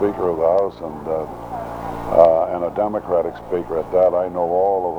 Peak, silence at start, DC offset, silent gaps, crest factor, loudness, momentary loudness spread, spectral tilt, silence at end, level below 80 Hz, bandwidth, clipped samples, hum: 0 dBFS; 0 s; under 0.1%; none; 18 dB; -19 LUFS; 14 LU; -8 dB/octave; 0 s; -46 dBFS; 10 kHz; under 0.1%; none